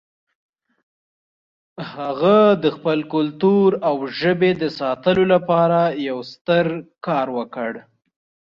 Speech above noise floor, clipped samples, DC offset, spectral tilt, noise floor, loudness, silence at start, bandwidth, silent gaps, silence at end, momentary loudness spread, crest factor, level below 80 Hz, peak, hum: over 72 dB; under 0.1%; under 0.1%; -8 dB/octave; under -90 dBFS; -19 LUFS; 1.8 s; 6.8 kHz; 6.41-6.45 s; 0.7 s; 12 LU; 16 dB; -60 dBFS; -4 dBFS; none